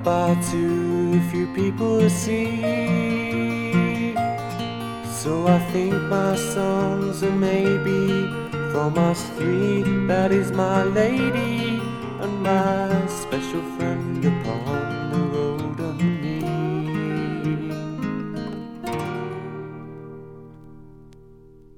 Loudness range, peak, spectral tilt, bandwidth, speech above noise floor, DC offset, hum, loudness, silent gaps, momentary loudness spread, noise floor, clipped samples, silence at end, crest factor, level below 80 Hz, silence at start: 7 LU; -6 dBFS; -6.5 dB/octave; 17 kHz; 26 dB; under 0.1%; none; -23 LUFS; none; 10 LU; -47 dBFS; under 0.1%; 0.05 s; 18 dB; -52 dBFS; 0 s